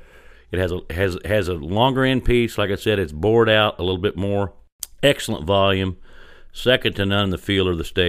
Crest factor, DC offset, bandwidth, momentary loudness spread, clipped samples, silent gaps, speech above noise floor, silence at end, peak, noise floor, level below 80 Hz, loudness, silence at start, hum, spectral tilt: 18 dB; under 0.1%; 15.5 kHz; 8 LU; under 0.1%; 4.72-4.79 s; 26 dB; 0 s; -2 dBFS; -46 dBFS; -36 dBFS; -20 LUFS; 0.5 s; none; -5.5 dB/octave